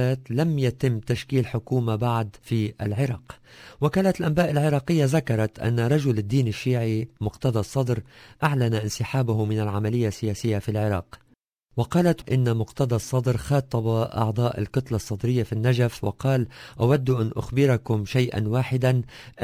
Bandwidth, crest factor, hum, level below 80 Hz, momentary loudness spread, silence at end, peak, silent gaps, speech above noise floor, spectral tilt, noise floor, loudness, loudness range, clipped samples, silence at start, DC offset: 16 kHz; 16 dB; none; -48 dBFS; 5 LU; 0 s; -8 dBFS; none; 39 dB; -7 dB/octave; -63 dBFS; -24 LUFS; 2 LU; under 0.1%; 0 s; under 0.1%